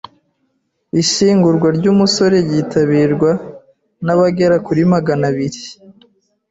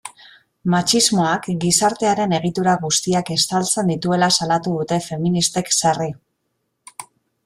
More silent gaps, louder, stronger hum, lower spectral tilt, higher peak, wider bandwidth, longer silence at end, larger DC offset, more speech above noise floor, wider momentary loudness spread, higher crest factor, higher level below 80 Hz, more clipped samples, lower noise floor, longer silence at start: neither; first, -14 LUFS vs -18 LUFS; neither; first, -5.5 dB/octave vs -3.5 dB/octave; about the same, -2 dBFS vs -2 dBFS; second, 8 kHz vs 14.5 kHz; first, 0.6 s vs 0.45 s; neither; about the same, 53 dB vs 54 dB; about the same, 11 LU vs 11 LU; second, 12 dB vs 18 dB; about the same, -52 dBFS vs -56 dBFS; neither; second, -66 dBFS vs -72 dBFS; first, 0.95 s vs 0.05 s